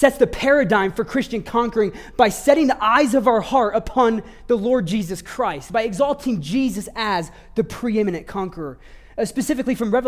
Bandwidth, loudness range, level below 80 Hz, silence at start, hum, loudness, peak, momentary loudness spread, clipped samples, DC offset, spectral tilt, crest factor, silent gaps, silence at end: 16 kHz; 6 LU; -44 dBFS; 0 s; none; -20 LUFS; -2 dBFS; 11 LU; under 0.1%; under 0.1%; -5 dB/octave; 18 dB; none; 0 s